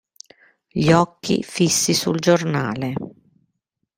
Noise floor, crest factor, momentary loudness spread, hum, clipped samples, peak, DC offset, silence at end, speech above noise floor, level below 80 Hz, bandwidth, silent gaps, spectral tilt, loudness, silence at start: -76 dBFS; 20 dB; 12 LU; none; under 0.1%; -2 dBFS; under 0.1%; 0.9 s; 57 dB; -56 dBFS; 16 kHz; none; -4.5 dB/octave; -19 LUFS; 0.75 s